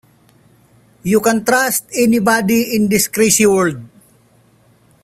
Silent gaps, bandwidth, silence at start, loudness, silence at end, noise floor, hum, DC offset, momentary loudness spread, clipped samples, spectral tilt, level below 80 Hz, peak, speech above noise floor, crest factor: none; 16 kHz; 1.05 s; -14 LUFS; 1.2 s; -52 dBFS; none; under 0.1%; 6 LU; under 0.1%; -4 dB/octave; -52 dBFS; 0 dBFS; 38 dB; 16 dB